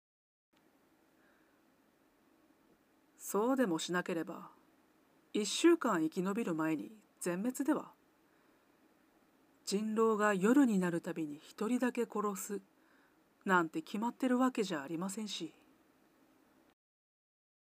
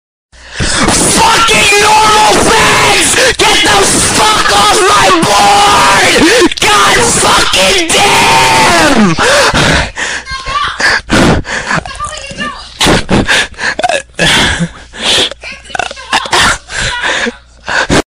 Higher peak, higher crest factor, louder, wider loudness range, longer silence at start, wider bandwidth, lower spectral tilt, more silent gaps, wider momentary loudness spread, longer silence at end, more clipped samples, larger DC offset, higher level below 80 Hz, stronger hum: second, -16 dBFS vs 0 dBFS; first, 20 dB vs 8 dB; second, -35 LUFS vs -7 LUFS; about the same, 6 LU vs 6 LU; first, 3.2 s vs 0.45 s; about the same, 15.5 kHz vs 16 kHz; first, -5 dB/octave vs -2.5 dB/octave; neither; first, 14 LU vs 11 LU; first, 2.1 s vs 0.05 s; neither; neither; second, under -90 dBFS vs -26 dBFS; neither